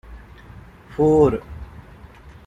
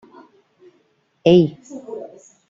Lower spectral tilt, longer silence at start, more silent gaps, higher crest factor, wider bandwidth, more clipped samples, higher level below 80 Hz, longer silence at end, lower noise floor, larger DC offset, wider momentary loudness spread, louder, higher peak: first, -9 dB/octave vs -7.5 dB/octave; second, 0.1 s vs 1.25 s; neither; about the same, 18 dB vs 20 dB; first, 8.4 kHz vs 7.4 kHz; neither; first, -40 dBFS vs -60 dBFS; second, 0.15 s vs 0.45 s; second, -43 dBFS vs -62 dBFS; neither; about the same, 23 LU vs 23 LU; about the same, -18 LUFS vs -16 LUFS; about the same, -4 dBFS vs -2 dBFS